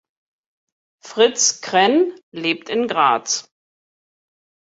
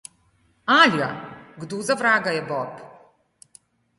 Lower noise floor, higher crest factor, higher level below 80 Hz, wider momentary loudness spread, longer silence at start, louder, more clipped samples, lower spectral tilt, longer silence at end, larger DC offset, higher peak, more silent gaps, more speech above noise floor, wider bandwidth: first, under -90 dBFS vs -63 dBFS; about the same, 20 dB vs 22 dB; about the same, -70 dBFS vs -68 dBFS; second, 9 LU vs 22 LU; first, 1.05 s vs 0.65 s; about the same, -18 LUFS vs -20 LUFS; neither; second, -1.5 dB/octave vs -3.5 dB/octave; first, 1.35 s vs 1.1 s; neither; about the same, -2 dBFS vs -2 dBFS; first, 2.23-2.32 s vs none; first, over 72 dB vs 42 dB; second, 8 kHz vs 11.5 kHz